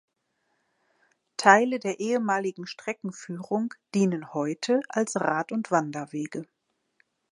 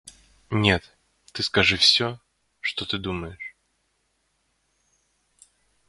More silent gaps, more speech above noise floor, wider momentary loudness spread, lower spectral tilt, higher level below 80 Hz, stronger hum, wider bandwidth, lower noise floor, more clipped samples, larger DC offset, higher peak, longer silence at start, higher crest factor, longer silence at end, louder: neither; about the same, 49 dB vs 48 dB; second, 16 LU vs 22 LU; first, -5 dB/octave vs -3.5 dB/octave; second, -80 dBFS vs -48 dBFS; neither; about the same, 11.5 kHz vs 11.5 kHz; first, -75 dBFS vs -71 dBFS; neither; neither; about the same, -2 dBFS vs -2 dBFS; first, 1.4 s vs 0.05 s; about the same, 26 dB vs 26 dB; second, 0.9 s vs 2.4 s; second, -26 LUFS vs -22 LUFS